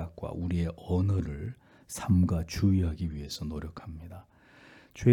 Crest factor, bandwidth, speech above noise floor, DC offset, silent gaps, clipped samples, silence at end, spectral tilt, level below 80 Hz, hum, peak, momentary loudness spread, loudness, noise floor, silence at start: 20 dB; 15 kHz; 26 dB; under 0.1%; none; under 0.1%; 0 s; -7 dB/octave; -48 dBFS; none; -10 dBFS; 19 LU; -30 LUFS; -56 dBFS; 0 s